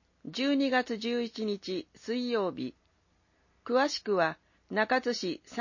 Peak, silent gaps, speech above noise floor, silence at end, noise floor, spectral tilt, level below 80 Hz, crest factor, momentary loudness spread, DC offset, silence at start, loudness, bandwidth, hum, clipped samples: -14 dBFS; none; 40 dB; 0 s; -70 dBFS; -4.5 dB/octave; -74 dBFS; 18 dB; 11 LU; under 0.1%; 0.25 s; -31 LUFS; 7.4 kHz; none; under 0.1%